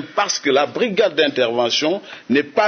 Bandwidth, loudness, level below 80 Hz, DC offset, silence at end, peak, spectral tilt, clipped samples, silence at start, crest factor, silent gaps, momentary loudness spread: 6.6 kHz; -18 LUFS; -70 dBFS; under 0.1%; 0 s; -2 dBFS; -3 dB/octave; under 0.1%; 0 s; 16 dB; none; 3 LU